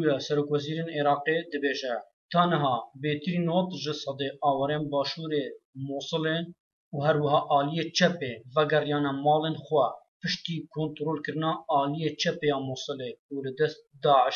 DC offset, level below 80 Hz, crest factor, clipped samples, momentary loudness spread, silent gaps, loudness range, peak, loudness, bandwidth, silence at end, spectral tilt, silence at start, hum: under 0.1%; -74 dBFS; 20 dB; under 0.1%; 10 LU; 2.13-2.29 s, 5.65-5.73 s, 6.60-6.91 s, 10.08-10.20 s, 13.19-13.29 s; 4 LU; -8 dBFS; -28 LUFS; 7.2 kHz; 0 s; -5.5 dB/octave; 0 s; none